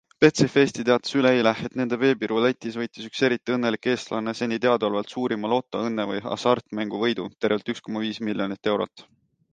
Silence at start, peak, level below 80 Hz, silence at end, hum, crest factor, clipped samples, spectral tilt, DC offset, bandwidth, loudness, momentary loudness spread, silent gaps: 0.2 s; -4 dBFS; -64 dBFS; 0.5 s; none; 20 dB; under 0.1%; -5.5 dB/octave; under 0.1%; 9.4 kHz; -24 LUFS; 9 LU; none